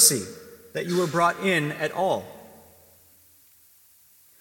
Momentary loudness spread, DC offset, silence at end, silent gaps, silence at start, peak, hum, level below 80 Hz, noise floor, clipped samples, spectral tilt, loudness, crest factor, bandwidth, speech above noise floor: 21 LU; under 0.1%; 1.95 s; none; 0 s; -2 dBFS; none; -70 dBFS; -57 dBFS; under 0.1%; -2.5 dB/octave; -24 LUFS; 24 dB; 17.5 kHz; 32 dB